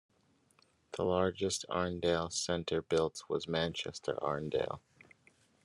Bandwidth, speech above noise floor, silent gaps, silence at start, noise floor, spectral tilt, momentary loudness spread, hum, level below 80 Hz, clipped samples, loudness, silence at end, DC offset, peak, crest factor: 12.5 kHz; 36 dB; none; 0.95 s; -71 dBFS; -4 dB/octave; 6 LU; none; -66 dBFS; under 0.1%; -35 LUFS; 0.85 s; under 0.1%; -18 dBFS; 18 dB